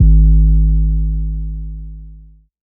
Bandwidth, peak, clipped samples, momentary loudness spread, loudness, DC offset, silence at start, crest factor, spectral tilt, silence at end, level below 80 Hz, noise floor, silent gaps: 0.6 kHz; -2 dBFS; under 0.1%; 21 LU; -15 LUFS; under 0.1%; 0 s; 12 dB; -23 dB/octave; 0.5 s; -14 dBFS; -40 dBFS; none